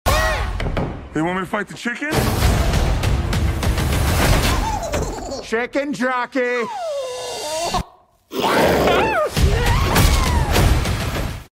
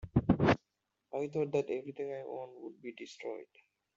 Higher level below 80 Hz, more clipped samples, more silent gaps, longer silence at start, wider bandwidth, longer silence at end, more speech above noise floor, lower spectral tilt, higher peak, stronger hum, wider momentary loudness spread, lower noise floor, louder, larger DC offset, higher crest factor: first, -24 dBFS vs -56 dBFS; neither; neither; about the same, 0.05 s vs 0 s; first, 16.5 kHz vs 7.8 kHz; second, 0.1 s vs 0.5 s; second, 28 dB vs 46 dB; second, -5 dB/octave vs -6.5 dB/octave; first, -2 dBFS vs -14 dBFS; neither; second, 10 LU vs 18 LU; second, -48 dBFS vs -85 dBFS; first, -20 LUFS vs -35 LUFS; neither; second, 16 dB vs 22 dB